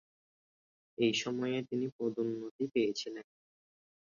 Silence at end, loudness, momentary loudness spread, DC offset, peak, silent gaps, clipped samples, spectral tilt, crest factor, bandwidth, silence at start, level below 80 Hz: 0.9 s; -35 LUFS; 11 LU; under 0.1%; -18 dBFS; 1.92-1.99 s, 2.51-2.59 s; under 0.1%; -4 dB/octave; 18 dB; 7.2 kHz; 1 s; -80 dBFS